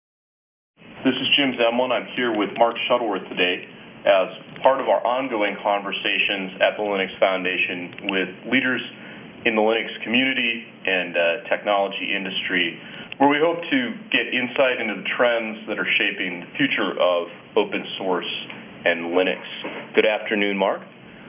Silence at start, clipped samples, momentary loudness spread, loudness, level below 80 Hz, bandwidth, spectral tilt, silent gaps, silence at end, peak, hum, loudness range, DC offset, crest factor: 0.8 s; under 0.1%; 7 LU; -21 LUFS; -68 dBFS; 3.8 kHz; -8 dB/octave; none; 0 s; -2 dBFS; none; 2 LU; under 0.1%; 20 dB